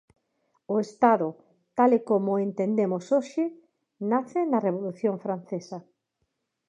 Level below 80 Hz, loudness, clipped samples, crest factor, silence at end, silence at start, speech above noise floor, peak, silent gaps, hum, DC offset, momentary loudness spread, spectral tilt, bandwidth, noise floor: -82 dBFS; -26 LUFS; under 0.1%; 22 dB; 0.9 s; 0.7 s; 53 dB; -6 dBFS; none; none; under 0.1%; 13 LU; -8 dB/octave; 9 kHz; -78 dBFS